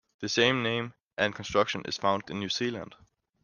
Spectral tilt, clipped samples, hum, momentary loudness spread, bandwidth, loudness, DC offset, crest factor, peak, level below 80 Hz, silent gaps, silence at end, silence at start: -4 dB/octave; under 0.1%; none; 10 LU; 10 kHz; -29 LUFS; under 0.1%; 22 dB; -8 dBFS; -64 dBFS; 1.02-1.07 s; 0.5 s; 0.2 s